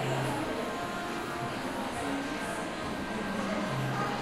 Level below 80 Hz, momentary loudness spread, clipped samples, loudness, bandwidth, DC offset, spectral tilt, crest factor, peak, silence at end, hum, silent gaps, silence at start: -54 dBFS; 3 LU; under 0.1%; -34 LUFS; 16 kHz; under 0.1%; -5 dB/octave; 14 dB; -20 dBFS; 0 s; none; none; 0 s